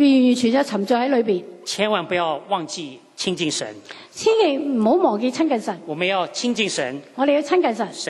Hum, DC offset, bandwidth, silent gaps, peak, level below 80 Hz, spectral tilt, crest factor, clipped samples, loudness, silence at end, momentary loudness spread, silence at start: none; under 0.1%; 12 kHz; none; -4 dBFS; -70 dBFS; -4 dB/octave; 16 dB; under 0.1%; -20 LUFS; 0 s; 11 LU; 0 s